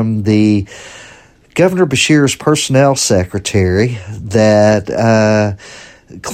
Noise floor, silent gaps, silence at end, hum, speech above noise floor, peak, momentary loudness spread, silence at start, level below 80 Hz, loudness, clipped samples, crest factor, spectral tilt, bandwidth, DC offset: -42 dBFS; none; 0 s; none; 30 dB; 0 dBFS; 14 LU; 0 s; -42 dBFS; -12 LUFS; under 0.1%; 12 dB; -5 dB/octave; 15.5 kHz; under 0.1%